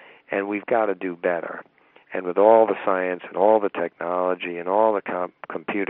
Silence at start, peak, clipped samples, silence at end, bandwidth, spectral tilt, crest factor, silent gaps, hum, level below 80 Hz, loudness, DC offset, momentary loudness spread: 0.3 s; -2 dBFS; under 0.1%; 0.05 s; 3.9 kHz; -4 dB/octave; 20 dB; none; none; -78 dBFS; -22 LUFS; under 0.1%; 13 LU